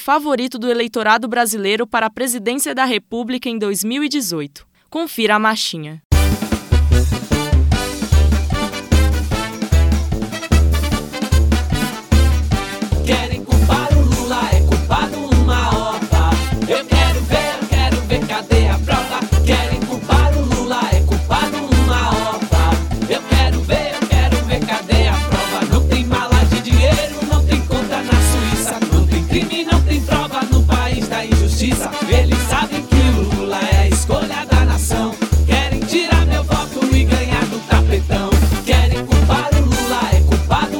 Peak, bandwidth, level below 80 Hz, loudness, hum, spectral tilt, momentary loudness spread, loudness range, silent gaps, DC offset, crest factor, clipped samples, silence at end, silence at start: 0 dBFS; 17.5 kHz; -18 dBFS; -16 LUFS; none; -5 dB/octave; 5 LU; 2 LU; 6.05-6.10 s; 0.2%; 14 dB; under 0.1%; 0 s; 0 s